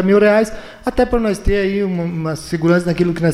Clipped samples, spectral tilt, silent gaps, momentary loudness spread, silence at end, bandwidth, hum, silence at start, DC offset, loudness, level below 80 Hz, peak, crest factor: under 0.1%; -7 dB/octave; none; 9 LU; 0 s; 13.5 kHz; none; 0 s; under 0.1%; -17 LUFS; -30 dBFS; -4 dBFS; 12 dB